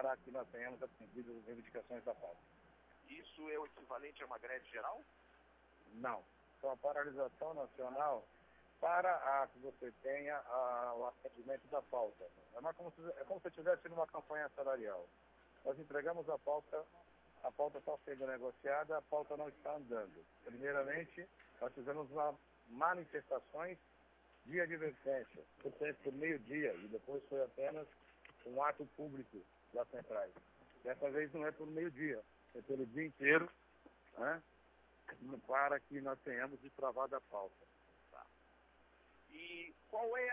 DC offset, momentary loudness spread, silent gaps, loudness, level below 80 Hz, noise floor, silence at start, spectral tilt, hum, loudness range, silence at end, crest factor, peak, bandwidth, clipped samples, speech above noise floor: under 0.1%; 15 LU; none; -44 LUFS; -78 dBFS; -70 dBFS; 0 s; -4 dB/octave; none; 9 LU; 0 s; 26 dB; -20 dBFS; 3.9 kHz; under 0.1%; 27 dB